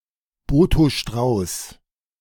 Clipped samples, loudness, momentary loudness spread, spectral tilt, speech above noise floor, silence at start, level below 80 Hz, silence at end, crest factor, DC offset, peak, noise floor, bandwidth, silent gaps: under 0.1%; -20 LUFS; 13 LU; -6 dB/octave; 19 dB; 0.5 s; -30 dBFS; 0.45 s; 16 dB; under 0.1%; -4 dBFS; -38 dBFS; 18 kHz; none